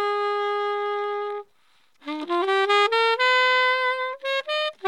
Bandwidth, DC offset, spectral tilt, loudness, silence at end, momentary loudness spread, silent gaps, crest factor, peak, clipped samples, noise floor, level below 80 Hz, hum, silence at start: 11.5 kHz; under 0.1%; 0 dB/octave; -22 LUFS; 0 s; 14 LU; none; 16 dB; -6 dBFS; under 0.1%; -64 dBFS; -90 dBFS; none; 0 s